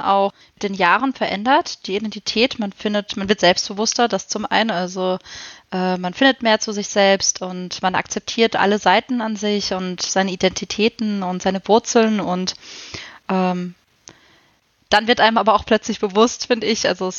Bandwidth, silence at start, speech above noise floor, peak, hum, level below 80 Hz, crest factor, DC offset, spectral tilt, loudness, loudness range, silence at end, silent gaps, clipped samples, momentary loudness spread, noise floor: 8 kHz; 0 s; 41 dB; 0 dBFS; none; -54 dBFS; 18 dB; under 0.1%; -3.5 dB/octave; -19 LUFS; 3 LU; 0 s; none; under 0.1%; 10 LU; -60 dBFS